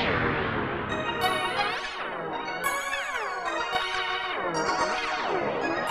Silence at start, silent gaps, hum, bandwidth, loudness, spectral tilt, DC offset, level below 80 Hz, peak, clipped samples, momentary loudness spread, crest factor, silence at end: 0 s; none; none; 15 kHz; -28 LUFS; -3.5 dB/octave; under 0.1%; -52 dBFS; -12 dBFS; under 0.1%; 5 LU; 16 dB; 0 s